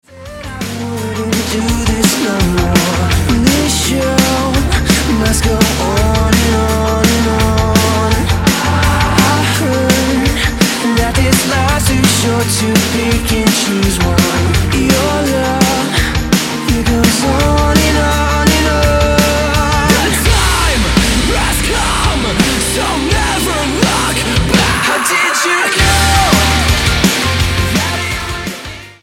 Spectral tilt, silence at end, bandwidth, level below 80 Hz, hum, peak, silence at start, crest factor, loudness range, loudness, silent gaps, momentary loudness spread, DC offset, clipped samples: -4 dB/octave; 0.1 s; 17 kHz; -20 dBFS; none; 0 dBFS; 0.1 s; 12 dB; 2 LU; -12 LUFS; none; 4 LU; under 0.1%; under 0.1%